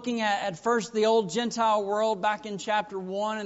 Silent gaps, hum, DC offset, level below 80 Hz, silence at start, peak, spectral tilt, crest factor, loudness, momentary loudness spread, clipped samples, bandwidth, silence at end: none; none; under 0.1%; -70 dBFS; 0 s; -12 dBFS; -2.5 dB/octave; 14 dB; -27 LUFS; 7 LU; under 0.1%; 8 kHz; 0 s